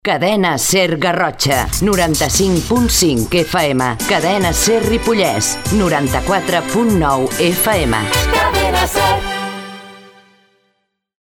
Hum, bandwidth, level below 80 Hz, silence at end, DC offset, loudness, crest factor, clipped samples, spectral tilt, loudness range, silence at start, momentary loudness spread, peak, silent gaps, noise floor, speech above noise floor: none; 18 kHz; -28 dBFS; 1.3 s; under 0.1%; -14 LUFS; 14 dB; under 0.1%; -3.5 dB/octave; 2 LU; 0.05 s; 3 LU; 0 dBFS; none; -67 dBFS; 53 dB